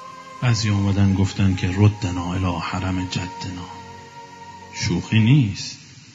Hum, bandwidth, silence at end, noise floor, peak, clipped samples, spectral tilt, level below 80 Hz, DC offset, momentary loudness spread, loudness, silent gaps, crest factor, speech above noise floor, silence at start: none; 7.8 kHz; 0.2 s; -40 dBFS; -4 dBFS; under 0.1%; -6 dB/octave; -48 dBFS; under 0.1%; 21 LU; -21 LUFS; none; 18 dB; 20 dB; 0 s